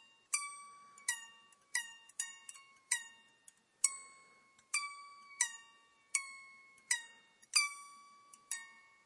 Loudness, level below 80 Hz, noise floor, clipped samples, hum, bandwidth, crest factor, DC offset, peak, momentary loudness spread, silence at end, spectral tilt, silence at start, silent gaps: -38 LUFS; under -90 dBFS; -67 dBFS; under 0.1%; none; 11.5 kHz; 30 dB; under 0.1%; -14 dBFS; 22 LU; 0.25 s; 5 dB/octave; 0 s; none